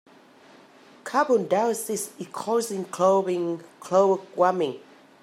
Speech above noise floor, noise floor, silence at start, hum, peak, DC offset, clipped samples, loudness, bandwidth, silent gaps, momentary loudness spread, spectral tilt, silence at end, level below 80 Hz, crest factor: 28 dB; -52 dBFS; 1.05 s; none; -8 dBFS; under 0.1%; under 0.1%; -24 LUFS; 16 kHz; none; 13 LU; -4.5 dB/octave; 0.4 s; -80 dBFS; 18 dB